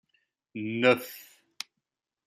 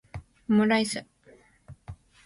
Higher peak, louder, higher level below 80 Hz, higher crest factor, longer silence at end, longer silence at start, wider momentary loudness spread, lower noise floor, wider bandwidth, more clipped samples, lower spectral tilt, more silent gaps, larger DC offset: first, -8 dBFS vs -12 dBFS; about the same, -27 LUFS vs -25 LUFS; second, -80 dBFS vs -56 dBFS; first, 24 dB vs 18 dB; first, 1.05 s vs 0.3 s; first, 0.55 s vs 0.15 s; second, 20 LU vs 25 LU; first, -86 dBFS vs -58 dBFS; first, 16 kHz vs 11.5 kHz; neither; about the same, -4.5 dB/octave vs -5 dB/octave; neither; neither